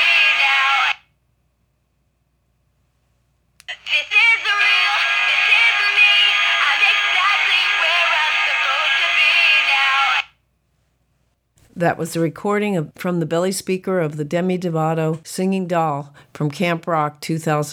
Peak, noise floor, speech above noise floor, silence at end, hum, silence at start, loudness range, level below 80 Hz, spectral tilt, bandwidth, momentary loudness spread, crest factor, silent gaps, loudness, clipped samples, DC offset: -4 dBFS; -66 dBFS; 45 dB; 0 s; none; 0 s; 9 LU; -64 dBFS; -3.5 dB/octave; 18 kHz; 11 LU; 16 dB; none; -15 LUFS; under 0.1%; under 0.1%